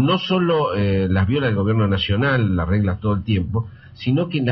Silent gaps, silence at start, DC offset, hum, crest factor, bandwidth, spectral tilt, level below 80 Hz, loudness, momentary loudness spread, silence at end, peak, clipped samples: none; 0 s; under 0.1%; none; 14 dB; 6 kHz; -5.5 dB/octave; -40 dBFS; -20 LUFS; 4 LU; 0 s; -6 dBFS; under 0.1%